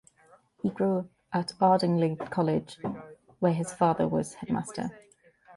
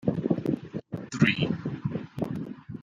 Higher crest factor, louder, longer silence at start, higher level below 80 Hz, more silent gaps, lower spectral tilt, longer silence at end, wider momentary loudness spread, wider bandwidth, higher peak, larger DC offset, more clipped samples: about the same, 18 dB vs 22 dB; about the same, -29 LUFS vs -29 LUFS; first, 0.65 s vs 0 s; about the same, -64 dBFS vs -60 dBFS; neither; about the same, -7 dB/octave vs -6.5 dB/octave; first, 0.6 s vs 0 s; about the same, 13 LU vs 13 LU; first, 11.5 kHz vs 9.2 kHz; about the same, -10 dBFS vs -8 dBFS; neither; neither